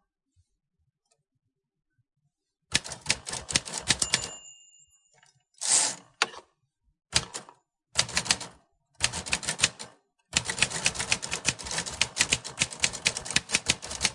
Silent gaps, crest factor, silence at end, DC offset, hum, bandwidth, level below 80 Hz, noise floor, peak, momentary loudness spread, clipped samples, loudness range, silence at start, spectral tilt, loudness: none; 28 dB; 0 s; under 0.1%; none; 11.5 kHz; -54 dBFS; -79 dBFS; -4 dBFS; 7 LU; under 0.1%; 4 LU; 2.7 s; -0.5 dB/octave; -27 LUFS